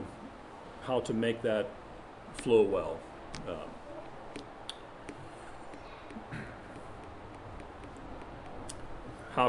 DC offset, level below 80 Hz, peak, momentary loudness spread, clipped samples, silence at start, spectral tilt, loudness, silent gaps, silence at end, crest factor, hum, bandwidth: under 0.1%; -56 dBFS; -12 dBFS; 17 LU; under 0.1%; 0 s; -5.5 dB/octave; -37 LUFS; none; 0 s; 26 dB; none; 11 kHz